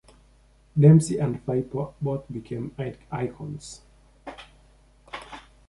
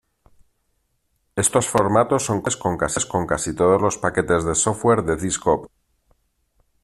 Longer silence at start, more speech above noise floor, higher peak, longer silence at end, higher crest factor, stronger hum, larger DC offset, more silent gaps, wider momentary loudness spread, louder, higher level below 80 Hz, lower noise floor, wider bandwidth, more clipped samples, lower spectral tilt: second, 0.75 s vs 1.35 s; second, 34 dB vs 49 dB; about the same, -4 dBFS vs -2 dBFS; second, 0.3 s vs 1.15 s; about the same, 22 dB vs 20 dB; neither; neither; neither; first, 26 LU vs 5 LU; second, -24 LUFS vs -20 LUFS; second, -54 dBFS vs -46 dBFS; second, -57 dBFS vs -69 dBFS; second, 11.5 kHz vs 14.5 kHz; neither; first, -8 dB/octave vs -4.5 dB/octave